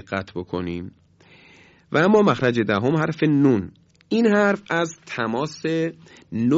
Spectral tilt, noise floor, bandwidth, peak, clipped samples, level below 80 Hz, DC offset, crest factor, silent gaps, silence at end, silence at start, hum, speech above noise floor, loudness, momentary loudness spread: -6.5 dB/octave; -51 dBFS; 7.8 kHz; -4 dBFS; under 0.1%; -54 dBFS; under 0.1%; 18 dB; none; 0 s; 0.1 s; none; 31 dB; -21 LUFS; 12 LU